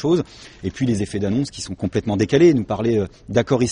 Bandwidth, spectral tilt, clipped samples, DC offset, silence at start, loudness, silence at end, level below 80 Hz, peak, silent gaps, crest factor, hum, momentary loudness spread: 10 kHz; -6.5 dB/octave; under 0.1%; under 0.1%; 0 s; -20 LUFS; 0 s; -46 dBFS; -2 dBFS; none; 16 dB; none; 12 LU